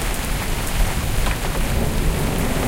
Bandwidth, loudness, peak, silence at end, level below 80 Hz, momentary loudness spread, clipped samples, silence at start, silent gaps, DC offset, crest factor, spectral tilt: 17 kHz; -23 LUFS; -6 dBFS; 0 s; -22 dBFS; 2 LU; under 0.1%; 0 s; none; under 0.1%; 14 dB; -4.5 dB/octave